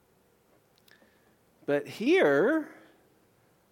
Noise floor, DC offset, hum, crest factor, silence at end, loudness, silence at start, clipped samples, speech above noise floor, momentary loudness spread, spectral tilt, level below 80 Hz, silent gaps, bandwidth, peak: -66 dBFS; under 0.1%; none; 18 dB; 1.05 s; -26 LUFS; 1.7 s; under 0.1%; 41 dB; 16 LU; -5.5 dB/octave; -82 dBFS; none; 16.5 kHz; -12 dBFS